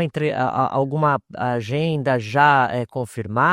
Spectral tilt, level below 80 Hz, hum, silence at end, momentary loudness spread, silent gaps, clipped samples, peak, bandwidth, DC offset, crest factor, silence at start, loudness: -7 dB/octave; -58 dBFS; none; 0 s; 10 LU; none; under 0.1%; -2 dBFS; 12.5 kHz; under 0.1%; 18 dB; 0 s; -20 LUFS